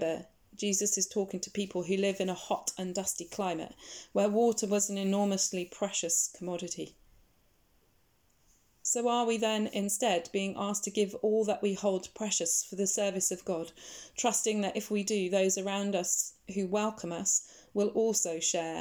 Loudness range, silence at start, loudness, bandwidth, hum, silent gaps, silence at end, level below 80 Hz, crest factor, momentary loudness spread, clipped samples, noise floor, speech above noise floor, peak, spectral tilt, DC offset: 4 LU; 0 s; -31 LUFS; 19 kHz; none; none; 0 s; -70 dBFS; 18 dB; 9 LU; under 0.1%; -70 dBFS; 38 dB; -14 dBFS; -3 dB/octave; under 0.1%